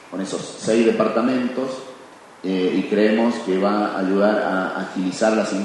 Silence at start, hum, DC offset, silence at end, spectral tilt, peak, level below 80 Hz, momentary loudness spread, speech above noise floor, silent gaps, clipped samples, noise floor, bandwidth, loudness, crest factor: 0 s; none; under 0.1%; 0 s; -5.5 dB/octave; -4 dBFS; -68 dBFS; 10 LU; 23 dB; none; under 0.1%; -43 dBFS; 11.5 kHz; -20 LUFS; 16 dB